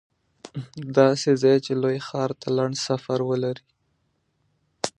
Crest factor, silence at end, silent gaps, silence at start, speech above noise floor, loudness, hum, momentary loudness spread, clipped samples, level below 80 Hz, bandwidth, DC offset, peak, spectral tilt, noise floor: 22 dB; 0.1 s; none; 0.45 s; 48 dB; -23 LUFS; none; 17 LU; under 0.1%; -68 dBFS; 11 kHz; under 0.1%; -2 dBFS; -5.5 dB/octave; -71 dBFS